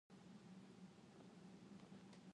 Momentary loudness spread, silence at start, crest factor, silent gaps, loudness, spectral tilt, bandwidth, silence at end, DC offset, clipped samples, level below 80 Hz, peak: 2 LU; 0.1 s; 12 dB; none; -63 LUFS; -6 dB/octave; 11 kHz; 0 s; under 0.1%; under 0.1%; -88 dBFS; -50 dBFS